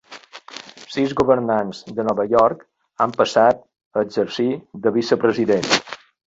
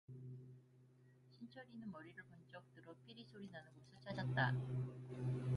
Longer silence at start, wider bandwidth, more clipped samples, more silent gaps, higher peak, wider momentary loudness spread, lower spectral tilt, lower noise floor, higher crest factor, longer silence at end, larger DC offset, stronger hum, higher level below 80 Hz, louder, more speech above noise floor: about the same, 0.1 s vs 0.1 s; second, 8 kHz vs 10.5 kHz; neither; first, 3.85-3.91 s vs none; first, -2 dBFS vs -24 dBFS; about the same, 20 LU vs 21 LU; second, -4.5 dB/octave vs -7.5 dB/octave; second, -41 dBFS vs -68 dBFS; about the same, 18 dB vs 22 dB; first, 0.3 s vs 0 s; neither; neither; first, -56 dBFS vs -74 dBFS; first, -19 LUFS vs -46 LUFS; about the same, 23 dB vs 22 dB